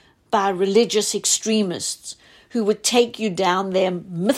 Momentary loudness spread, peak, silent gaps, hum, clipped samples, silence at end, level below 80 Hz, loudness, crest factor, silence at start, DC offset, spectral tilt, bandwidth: 9 LU; -4 dBFS; none; none; under 0.1%; 0 s; -64 dBFS; -20 LUFS; 16 dB; 0.3 s; under 0.1%; -3 dB/octave; 16 kHz